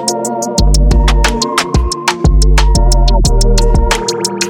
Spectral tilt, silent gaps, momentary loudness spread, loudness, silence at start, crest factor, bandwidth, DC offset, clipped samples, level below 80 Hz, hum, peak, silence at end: -4 dB/octave; none; 4 LU; -12 LUFS; 0 s; 10 dB; 16 kHz; under 0.1%; under 0.1%; -10 dBFS; none; 0 dBFS; 0 s